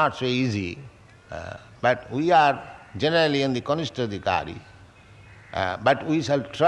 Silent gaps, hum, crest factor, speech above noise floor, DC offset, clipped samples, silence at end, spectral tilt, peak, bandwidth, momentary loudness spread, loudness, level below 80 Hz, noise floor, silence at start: none; none; 18 dB; 26 dB; under 0.1%; under 0.1%; 0 s; -5.5 dB/octave; -6 dBFS; 11 kHz; 18 LU; -24 LUFS; -58 dBFS; -49 dBFS; 0 s